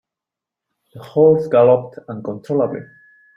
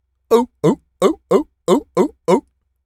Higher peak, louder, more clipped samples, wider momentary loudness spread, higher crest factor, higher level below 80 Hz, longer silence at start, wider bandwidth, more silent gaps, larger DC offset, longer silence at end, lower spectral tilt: about the same, -2 dBFS vs 0 dBFS; about the same, -16 LUFS vs -18 LUFS; neither; first, 17 LU vs 3 LU; about the same, 18 dB vs 18 dB; second, -60 dBFS vs -54 dBFS; first, 0.95 s vs 0.3 s; second, 5.4 kHz vs 14.5 kHz; neither; neither; about the same, 0.5 s vs 0.45 s; first, -9.5 dB/octave vs -6.5 dB/octave